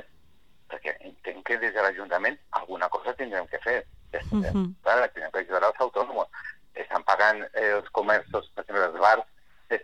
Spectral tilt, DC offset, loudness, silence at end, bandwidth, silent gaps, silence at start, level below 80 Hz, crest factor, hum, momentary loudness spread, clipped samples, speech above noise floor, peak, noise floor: -6 dB/octave; 0.2%; -26 LUFS; 0 s; 11 kHz; none; 0.7 s; -52 dBFS; 22 dB; none; 15 LU; under 0.1%; 37 dB; -6 dBFS; -63 dBFS